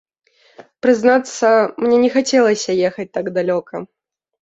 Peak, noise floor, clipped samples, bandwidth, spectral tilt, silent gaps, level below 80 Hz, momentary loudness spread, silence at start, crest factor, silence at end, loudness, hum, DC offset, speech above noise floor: -2 dBFS; -45 dBFS; under 0.1%; 8.2 kHz; -4.5 dB/octave; none; -62 dBFS; 8 LU; 0.85 s; 16 dB; 0.55 s; -16 LUFS; none; under 0.1%; 30 dB